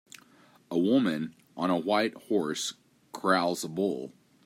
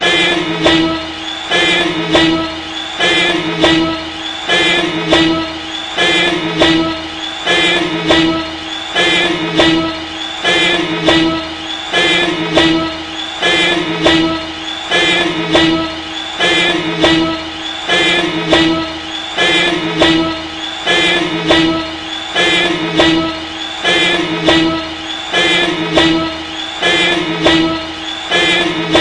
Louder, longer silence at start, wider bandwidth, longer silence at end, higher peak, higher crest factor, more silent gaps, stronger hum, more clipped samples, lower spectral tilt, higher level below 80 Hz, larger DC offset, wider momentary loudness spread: second, -29 LUFS vs -12 LUFS; first, 0.7 s vs 0 s; first, 16 kHz vs 11 kHz; first, 0.35 s vs 0 s; second, -10 dBFS vs 0 dBFS; first, 20 dB vs 14 dB; neither; neither; neither; about the same, -4.5 dB/octave vs -3.5 dB/octave; second, -76 dBFS vs -40 dBFS; neither; about the same, 11 LU vs 10 LU